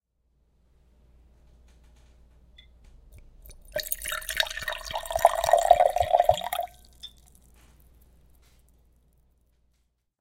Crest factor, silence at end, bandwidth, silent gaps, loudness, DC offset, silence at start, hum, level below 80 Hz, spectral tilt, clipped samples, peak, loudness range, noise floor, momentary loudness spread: 28 dB; 3.15 s; 17 kHz; none; -25 LUFS; under 0.1%; 3.45 s; none; -50 dBFS; -1.5 dB/octave; under 0.1%; -2 dBFS; 15 LU; -72 dBFS; 21 LU